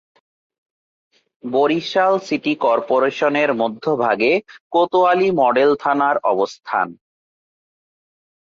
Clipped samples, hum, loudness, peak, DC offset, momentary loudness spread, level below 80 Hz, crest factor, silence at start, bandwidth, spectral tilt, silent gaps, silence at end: under 0.1%; none; -18 LUFS; -4 dBFS; under 0.1%; 7 LU; -66 dBFS; 14 dB; 1.45 s; 7.4 kHz; -5.5 dB/octave; 4.60-4.70 s; 1.55 s